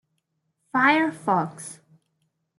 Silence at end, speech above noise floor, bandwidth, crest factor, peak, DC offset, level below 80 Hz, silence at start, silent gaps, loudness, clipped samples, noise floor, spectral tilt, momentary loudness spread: 0.85 s; 53 dB; 12 kHz; 22 dB; -6 dBFS; under 0.1%; -78 dBFS; 0.75 s; none; -22 LUFS; under 0.1%; -75 dBFS; -4.5 dB/octave; 19 LU